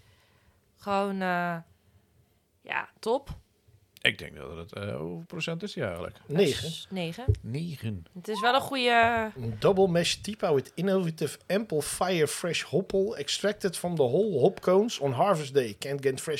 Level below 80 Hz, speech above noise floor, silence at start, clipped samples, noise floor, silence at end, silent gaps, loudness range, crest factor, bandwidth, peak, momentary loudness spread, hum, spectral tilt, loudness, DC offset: -52 dBFS; 38 dB; 0.8 s; under 0.1%; -66 dBFS; 0 s; none; 7 LU; 24 dB; 16 kHz; -4 dBFS; 13 LU; none; -4.5 dB/octave; -28 LUFS; under 0.1%